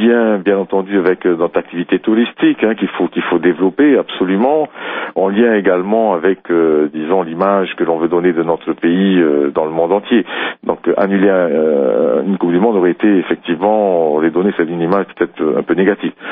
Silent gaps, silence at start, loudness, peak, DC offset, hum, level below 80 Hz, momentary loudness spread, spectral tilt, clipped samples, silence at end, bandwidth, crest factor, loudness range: none; 0 s; -14 LUFS; 0 dBFS; under 0.1%; none; -58 dBFS; 5 LU; -5 dB/octave; under 0.1%; 0 s; 3.9 kHz; 14 dB; 1 LU